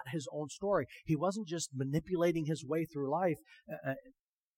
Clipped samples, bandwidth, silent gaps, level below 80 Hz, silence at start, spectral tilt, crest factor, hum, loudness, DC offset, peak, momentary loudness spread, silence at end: under 0.1%; 16.5 kHz; none; -66 dBFS; 0 s; -6 dB/octave; 18 dB; none; -36 LUFS; under 0.1%; -18 dBFS; 9 LU; 0.45 s